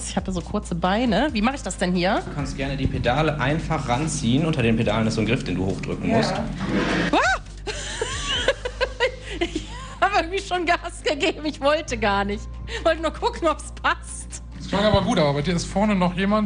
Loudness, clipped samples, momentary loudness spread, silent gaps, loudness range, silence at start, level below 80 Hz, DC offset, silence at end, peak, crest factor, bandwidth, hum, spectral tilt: -23 LUFS; under 0.1%; 8 LU; none; 2 LU; 0 s; -36 dBFS; under 0.1%; 0 s; -4 dBFS; 18 dB; 10 kHz; none; -5 dB/octave